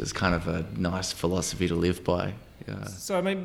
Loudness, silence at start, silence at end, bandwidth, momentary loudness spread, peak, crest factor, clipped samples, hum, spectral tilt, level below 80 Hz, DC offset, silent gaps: -29 LUFS; 0 s; 0 s; 16 kHz; 11 LU; -8 dBFS; 20 dB; under 0.1%; none; -5 dB/octave; -46 dBFS; under 0.1%; none